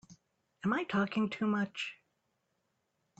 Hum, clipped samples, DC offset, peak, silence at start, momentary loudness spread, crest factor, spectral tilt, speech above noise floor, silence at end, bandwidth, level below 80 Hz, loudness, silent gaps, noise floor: none; under 0.1%; under 0.1%; -18 dBFS; 0.1 s; 8 LU; 18 dB; -6 dB/octave; 48 dB; 1.25 s; 8 kHz; -74 dBFS; -34 LUFS; none; -81 dBFS